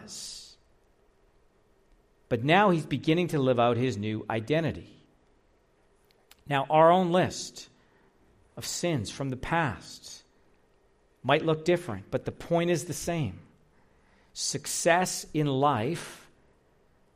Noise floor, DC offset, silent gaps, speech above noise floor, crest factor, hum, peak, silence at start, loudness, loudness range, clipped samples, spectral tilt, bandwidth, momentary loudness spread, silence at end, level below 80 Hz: -65 dBFS; under 0.1%; none; 38 dB; 22 dB; none; -8 dBFS; 0 s; -27 LUFS; 5 LU; under 0.1%; -5 dB/octave; 15 kHz; 18 LU; 1 s; -58 dBFS